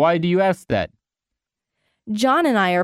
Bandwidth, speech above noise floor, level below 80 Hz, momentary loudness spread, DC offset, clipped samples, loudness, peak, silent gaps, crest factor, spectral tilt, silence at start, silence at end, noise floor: 15 kHz; 67 dB; -54 dBFS; 10 LU; under 0.1%; under 0.1%; -19 LUFS; -6 dBFS; none; 14 dB; -6 dB/octave; 0 s; 0 s; -85 dBFS